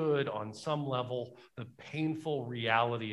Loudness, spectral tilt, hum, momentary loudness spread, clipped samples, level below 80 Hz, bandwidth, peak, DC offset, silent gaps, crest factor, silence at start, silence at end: -34 LUFS; -6.5 dB/octave; none; 16 LU; under 0.1%; -74 dBFS; 11.5 kHz; -12 dBFS; under 0.1%; none; 22 dB; 0 s; 0 s